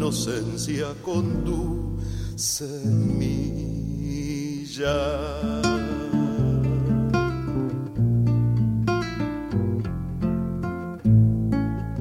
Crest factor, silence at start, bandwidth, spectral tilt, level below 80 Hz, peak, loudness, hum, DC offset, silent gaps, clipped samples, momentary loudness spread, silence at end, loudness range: 16 dB; 0 s; 15 kHz; -6.5 dB/octave; -36 dBFS; -8 dBFS; -25 LUFS; none; under 0.1%; none; under 0.1%; 8 LU; 0 s; 3 LU